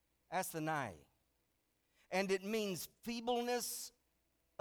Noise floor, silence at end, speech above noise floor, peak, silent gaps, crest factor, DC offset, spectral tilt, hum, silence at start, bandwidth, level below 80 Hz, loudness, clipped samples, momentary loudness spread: -81 dBFS; 0.7 s; 41 dB; -24 dBFS; none; 20 dB; under 0.1%; -3.5 dB/octave; none; 0.3 s; over 20 kHz; -76 dBFS; -40 LUFS; under 0.1%; 9 LU